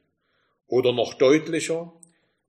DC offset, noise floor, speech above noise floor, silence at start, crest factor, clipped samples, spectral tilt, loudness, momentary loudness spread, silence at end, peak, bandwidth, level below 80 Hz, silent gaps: under 0.1%; -71 dBFS; 49 dB; 0.7 s; 18 dB; under 0.1%; -4.5 dB/octave; -22 LUFS; 11 LU; 0.6 s; -6 dBFS; 13 kHz; -72 dBFS; none